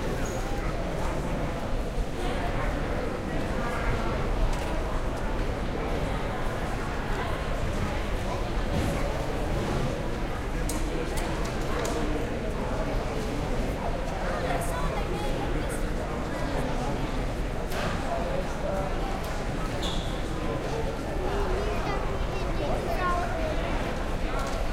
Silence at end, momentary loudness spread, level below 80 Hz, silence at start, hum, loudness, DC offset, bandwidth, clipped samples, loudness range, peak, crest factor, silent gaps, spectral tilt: 0 s; 3 LU; -32 dBFS; 0 s; none; -31 LUFS; under 0.1%; 15.5 kHz; under 0.1%; 1 LU; -14 dBFS; 14 dB; none; -5.5 dB/octave